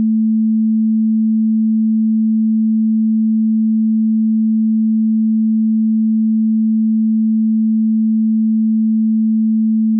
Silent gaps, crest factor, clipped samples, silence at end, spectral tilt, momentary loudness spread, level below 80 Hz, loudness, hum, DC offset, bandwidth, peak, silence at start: none; 4 dB; under 0.1%; 0 s; -20 dB/octave; 0 LU; under -90 dBFS; -15 LUFS; none; under 0.1%; 0.3 kHz; -10 dBFS; 0 s